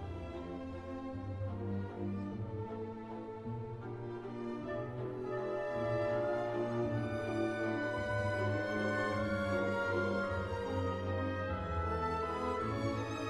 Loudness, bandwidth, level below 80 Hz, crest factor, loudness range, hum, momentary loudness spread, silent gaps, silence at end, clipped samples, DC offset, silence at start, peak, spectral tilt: -38 LUFS; 12 kHz; -54 dBFS; 14 dB; 7 LU; none; 9 LU; none; 0 s; under 0.1%; under 0.1%; 0 s; -22 dBFS; -7 dB/octave